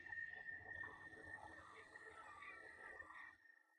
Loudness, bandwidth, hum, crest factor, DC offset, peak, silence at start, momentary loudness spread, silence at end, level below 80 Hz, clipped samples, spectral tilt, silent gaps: -55 LUFS; 10 kHz; none; 16 dB; under 0.1%; -42 dBFS; 0 s; 9 LU; 0 s; -80 dBFS; under 0.1%; -4 dB/octave; none